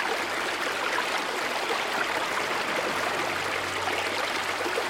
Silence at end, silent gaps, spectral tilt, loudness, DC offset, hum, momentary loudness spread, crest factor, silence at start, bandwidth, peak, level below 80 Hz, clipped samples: 0 s; none; -1.5 dB/octave; -27 LUFS; under 0.1%; none; 1 LU; 16 dB; 0 s; 16.5 kHz; -12 dBFS; -64 dBFS; under 0.1%